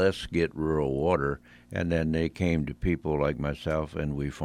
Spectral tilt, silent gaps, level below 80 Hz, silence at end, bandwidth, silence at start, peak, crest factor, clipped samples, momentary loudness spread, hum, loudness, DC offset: -7.5 dB/octave; none; -42 dBFS; 0 s; 12.5 kHz; 0 s; -10 dBFS; 18 dB; under 0.1%; 6 LU; none; -29 LUFS; under 0.1%